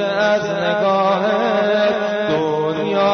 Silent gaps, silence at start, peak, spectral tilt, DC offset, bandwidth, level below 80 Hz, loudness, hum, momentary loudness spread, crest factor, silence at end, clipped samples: none; 0 s; -6 dBFS; -5.5 dB/octave; under 0.1%; 6.6 kHz; -58 dBFS; -17 LUFS; none; 3 LU; 12 dB; 0 s; under 0.1%